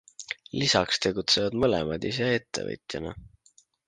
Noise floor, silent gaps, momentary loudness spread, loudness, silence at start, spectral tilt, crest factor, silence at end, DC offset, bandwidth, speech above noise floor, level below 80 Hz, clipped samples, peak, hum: -63 dBFS; none; 14 LU; -26 LUFS; 0.2 s; -3.5 dB/octave; 22 dB; 0.6 s; under 0.1%; 10 kHz; 36 dB; -52 dBFS; under 0.1%; -6 dBFS; none